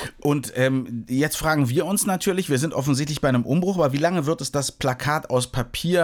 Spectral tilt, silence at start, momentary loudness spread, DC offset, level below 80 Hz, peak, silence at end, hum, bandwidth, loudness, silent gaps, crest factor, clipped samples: -5 dB/octave; 0 s; 4 LU; under 0.1%; -46 dBFS; -8 dBFS; 0 s; none; over 20 kHz; -23 LUFS; none; 14 dB; under 0.1%